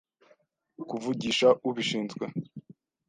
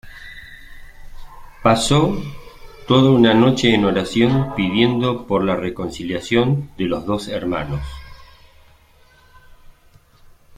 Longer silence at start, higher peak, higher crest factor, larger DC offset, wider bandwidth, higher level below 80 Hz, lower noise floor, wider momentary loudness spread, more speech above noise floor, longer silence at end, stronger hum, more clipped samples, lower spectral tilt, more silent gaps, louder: first, 0.8 s vs 0.05 s; second, -10 dBFS vs -2 dBFS; about the same, 22 dB vs 18 dB; neither; second, 9.6 kHz vs 15 kHz; second, -70 dBFS vs -40 dBFS; first, -66 dBFS vs -51 dBFS; first, 22 LU vs 17 LU; first, 38 dB vs 34 dB; second, 0.35 s vs 2.35 s; neither; neither; second, -4.5 dB/octave vs -6 dB/octave; neither; second, -28 LUFS vs -18 LUFS